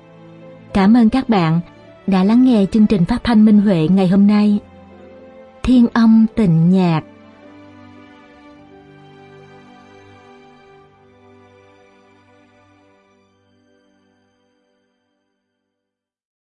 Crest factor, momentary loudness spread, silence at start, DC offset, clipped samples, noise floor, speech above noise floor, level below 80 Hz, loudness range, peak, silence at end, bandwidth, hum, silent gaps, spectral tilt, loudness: 16 dB; 10 LU; 0.75 s; under 0.1%; under 0.1%; -81 dBFS; 69 dB; -42 dBFS; 6 LU; -2 dBFS; 9.55 s; 9.6 kHz; none; none; -8.5 dB/octave; -14 LUFS